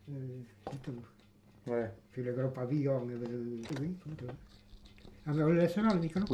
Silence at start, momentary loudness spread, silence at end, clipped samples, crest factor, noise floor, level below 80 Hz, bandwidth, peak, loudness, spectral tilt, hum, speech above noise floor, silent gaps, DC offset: 0.05 s; 17 LU; 0 s; under 0.1%; 18 dB; -62 dBFS; -60 dBFS; 13 kHz; -16 dBFS; -35 LUFS; -8.5 dB/octave; none; 28 dB; none; under 0.1%